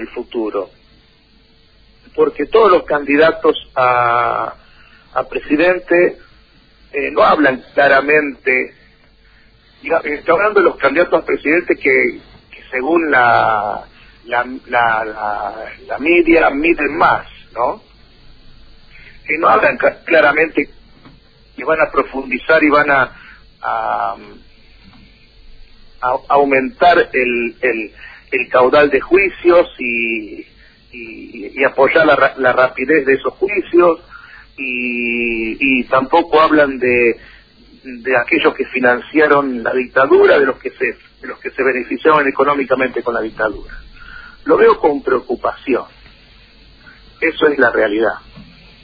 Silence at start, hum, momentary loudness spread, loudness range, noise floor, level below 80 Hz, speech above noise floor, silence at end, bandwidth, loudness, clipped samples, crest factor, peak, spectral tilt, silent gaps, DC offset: 0 s; none; 13 LU; 3 LU; -50 dBFS; -44 dBFS; 36 dB; 0.4 s; 5 kHz; -14 LUFS; under 0.1%; 16 dB; 0 dBFS; -7.5 dB/octave; none; under 0.1%